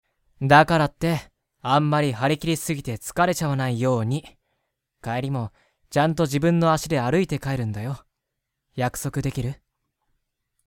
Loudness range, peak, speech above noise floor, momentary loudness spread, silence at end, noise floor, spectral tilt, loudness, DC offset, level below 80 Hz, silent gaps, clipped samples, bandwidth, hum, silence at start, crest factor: 6 LU; -2 dBFS; 59 dB; 12 LU; 1.15 s; -81 dBFS; -6 dB/octave; -23 LUFS; under 0.1%; -50 dBFS; none; under 0.1%; 17 kHz; none; 0.4 s; 22 dB